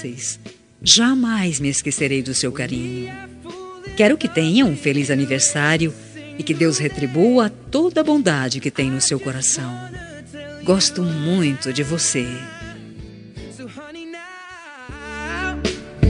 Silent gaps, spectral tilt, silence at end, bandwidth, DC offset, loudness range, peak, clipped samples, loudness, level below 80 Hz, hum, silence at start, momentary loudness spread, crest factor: none; -3.5 dB/octave; 0 s; 11 kHz; under 0.1%; 8 LU; 0 dBFS; under 0.1%; -19 LUFS; -40 dBFS; none; 0 s; 20 LU; 20 dB